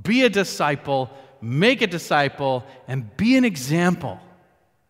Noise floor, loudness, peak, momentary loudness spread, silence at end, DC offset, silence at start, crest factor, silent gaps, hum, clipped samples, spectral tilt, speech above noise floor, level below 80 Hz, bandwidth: -61 dBFS; -21 LUFS; -4 dBFS; 13 LU; 0.7 s; under 0.1%; 0 s; 18 dB; none; none; under 0.1%; -5.5 dB/octave; 40 dB; -58 dBFS; 16 kHz